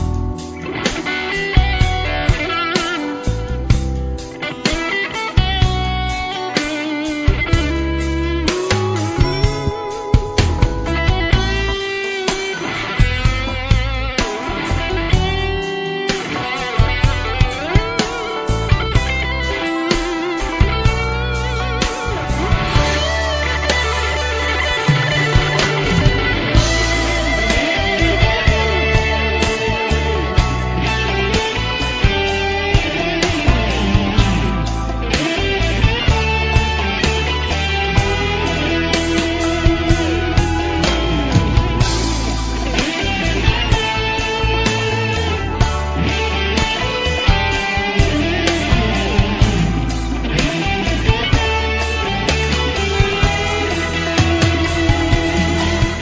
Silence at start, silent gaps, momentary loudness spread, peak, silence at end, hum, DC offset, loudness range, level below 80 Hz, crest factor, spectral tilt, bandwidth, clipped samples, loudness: 0 s; none; 5 LU; 0 dBFS; 0 s; none; under 0.1%; 3 LU; -22 dBFS; 16 dB; -5 dB/octave; 8 kHz; under 0.1%; -17 LUFS